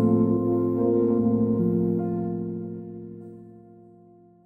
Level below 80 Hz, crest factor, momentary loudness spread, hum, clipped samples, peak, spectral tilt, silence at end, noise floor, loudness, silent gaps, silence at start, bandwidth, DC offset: -58 dBFS; 14 dB; 18 LU; none; under 0.1%; -10 dBFS; -13.5 dB/octave; 0.85 s; -53 dBFS; -24 LUFS; none; 0 s; 2.2 kHz; under 0.1%